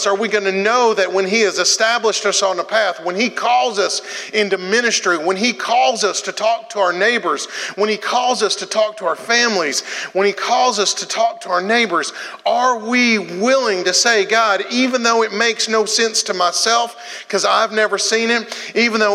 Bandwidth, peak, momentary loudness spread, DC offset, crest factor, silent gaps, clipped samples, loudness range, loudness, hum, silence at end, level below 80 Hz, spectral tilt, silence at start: 14.5 kHz; 0 dBFS; 5 LU; under 0.1%; 16 dB; none; under 0.1%; 2 LU; -16 LUFS; none; 0 s; -84 dBFS; -1.5 dB/octave; 0 s